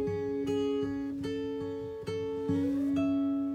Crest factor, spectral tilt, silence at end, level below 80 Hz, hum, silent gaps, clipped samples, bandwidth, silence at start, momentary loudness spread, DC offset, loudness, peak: 12 dB; -7.5 dB/octave; 0 s; -62 dBFS; none; none; under 0.1%; 9 kHz; 0 s; 7 LU; under 0.1%; -32 LUFS; -20 dBFS